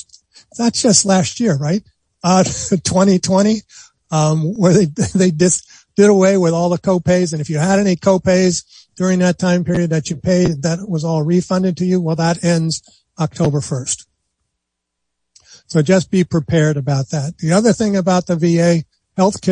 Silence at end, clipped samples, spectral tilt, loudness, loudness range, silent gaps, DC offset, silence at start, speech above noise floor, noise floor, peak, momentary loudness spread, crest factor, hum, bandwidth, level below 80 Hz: 0 s; under 0.1%; -5.5 dB/octave; -15 LUFS; 5 LU; none; under 0.1%; 0.55 s; 62 dB; -76 dBFS; 0 dBFS; 8 LU; 16 dB; none; 10.5 kHz; -48 dBFS